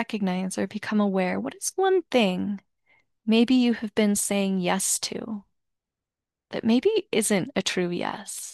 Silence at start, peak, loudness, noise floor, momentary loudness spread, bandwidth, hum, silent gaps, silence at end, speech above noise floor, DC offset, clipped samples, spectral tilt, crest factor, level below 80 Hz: 0 s; -8 dBFS; -25 LUFS; -89 dBFS; 11 LU; 12.5 kHz; none; none; 0 s; 64 dB; under 0.1%; under 0.1%; -4 dB/octave; 16 dB; -66 dBFS